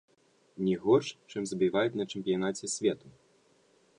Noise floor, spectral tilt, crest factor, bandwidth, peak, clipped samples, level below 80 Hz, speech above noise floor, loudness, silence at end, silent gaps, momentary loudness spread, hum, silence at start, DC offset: -66 dBFS; -5 dB/octave; 20 dB; 11 kHz; -12 dBFS; under 0.1%; -70 dBFS; 36 dB; -30 LUFS; 0.9 s; none; 11 LU; none; 0.55 s; under 0.1%